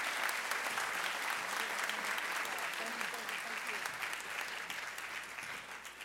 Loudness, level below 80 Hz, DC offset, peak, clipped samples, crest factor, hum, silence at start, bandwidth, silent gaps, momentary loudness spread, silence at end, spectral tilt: -38 LUFS; -76 dBFS; under 0.1%; -16 dBFS; under 0.1%; 24 dB; none; 0 s; 16.5 kHz; none; 7 LU; 0 s; 0 dB/octave